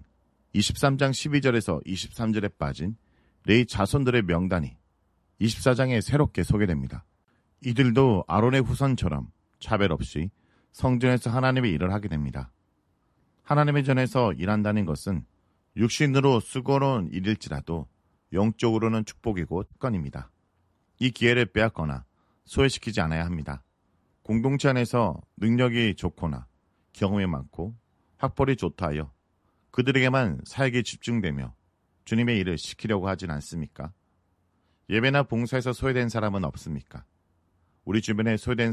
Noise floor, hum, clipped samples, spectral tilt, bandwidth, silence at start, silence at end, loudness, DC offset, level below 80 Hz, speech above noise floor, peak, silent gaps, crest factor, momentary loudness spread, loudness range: -70 dBFS; none; under 0.1%; -6 dB/octave; 13 kHz; 0 s; 0 s; -26 LUFS; under 0.1%; -44 dBFS; 45 dB; -6 dBFS; none; 20 dB; 13 LU; 4 LU